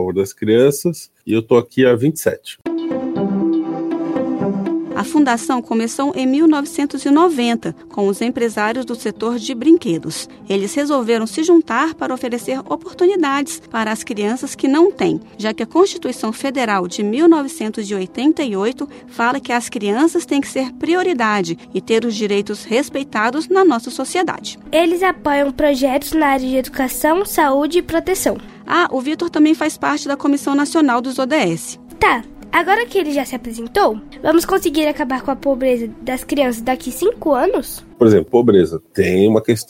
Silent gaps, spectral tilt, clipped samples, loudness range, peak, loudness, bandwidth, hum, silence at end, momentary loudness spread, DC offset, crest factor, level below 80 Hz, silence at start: none; -5 dB/octave; under 0.1%; 2 LU; 0 dBFS; -17 LUFS; 16.5 kHz; none; 0.05 s; 9 LU; under 0.1%; 16 dB; -46 dBFS; 0 s